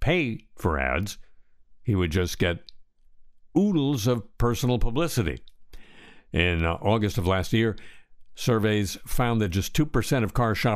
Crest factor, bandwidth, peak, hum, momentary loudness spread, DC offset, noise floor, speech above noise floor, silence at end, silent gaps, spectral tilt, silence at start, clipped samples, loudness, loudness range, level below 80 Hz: 18 dB; 15.5 kHz; -6 dBFS; none; 7 LU; under 0.1%; -51 dBFS; 26 dB; 0 s; none; -6 dB/octave; 0 s; under 0.1%; -26 LUFS; 2 LU; -36 dBFS